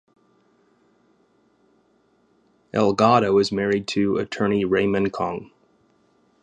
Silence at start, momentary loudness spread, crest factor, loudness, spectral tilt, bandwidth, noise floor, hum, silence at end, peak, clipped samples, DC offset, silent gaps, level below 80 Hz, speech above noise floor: 2.75 s; 11 LU; 22 dB; -21 LUFS; -6 dB/octave; 9.4 kHz; -63 dBFS; none; 0.95 s; -2 dBFS; under 0.1%; under 0.1%; none; -56 dBFS; 42 dB